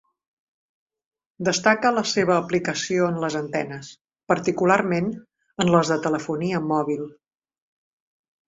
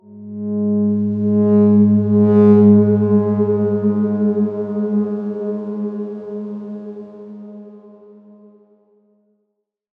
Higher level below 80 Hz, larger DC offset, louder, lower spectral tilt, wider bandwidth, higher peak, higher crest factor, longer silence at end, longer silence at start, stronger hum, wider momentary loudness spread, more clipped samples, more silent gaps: first, -62 dBFS vs -72 dBFS; neither; second, -22 LUFS vs -15 LUFS; second, -5 dB/octave vs -13 dB/octave; first, 8 kHz vs 2.5 kHz; about the same, -2 dBFS vs -2 dBFS; first, 22 dB vs 16 dB; second, 1.4 s vs 2.2 s; first, 1.4 s vs 0.1 s; neither; second, 11 LU vs 21 LU; neither; first, 4.01-4.05 s vs none